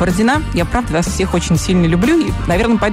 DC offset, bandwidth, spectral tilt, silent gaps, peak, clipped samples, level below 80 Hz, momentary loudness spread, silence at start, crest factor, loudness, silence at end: under 0.1%; 16 kHz; -5.5 dB/octave; none; -4 dBFS; under 0.1%; -24 dBFS; 4 LU; 0 s; 10 dB; -15 LUFS; 0 s